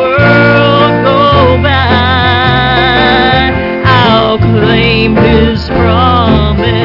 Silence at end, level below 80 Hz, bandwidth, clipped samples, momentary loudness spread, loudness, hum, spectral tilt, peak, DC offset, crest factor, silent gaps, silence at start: 0 s; -22 dBFS; 5.8 kHz; under 0.1%; 3 LU; -7 LUFS; none; -8 dB/octave; 0 dBFS; under 0.1%; 6 dB; none; 0 s